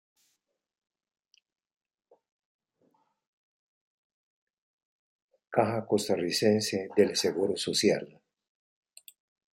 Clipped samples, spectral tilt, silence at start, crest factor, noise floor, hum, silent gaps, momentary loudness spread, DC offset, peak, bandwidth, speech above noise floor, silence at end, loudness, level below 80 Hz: under 0.1%; -4 dB/octave; 5.5 s; 24 dB; -80 dBFS; none; none; 5 LU; under 0.1%; -8 dBFS; 16 kHz; 53 dB; 1.5 s; -28 LUFS; -76 dBFS